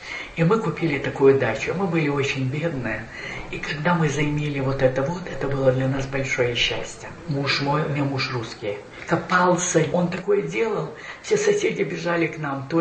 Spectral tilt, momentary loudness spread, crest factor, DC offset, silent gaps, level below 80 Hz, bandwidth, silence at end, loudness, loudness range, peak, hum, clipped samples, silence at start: -5 dB/octave; 11 LU; 18 dB; under 0.1%; none; -46 dBFS; 8.8 kHz; 0 s; -23 LUFS; 2 LU; -6 dBFS; none; under 0.1%; 0 s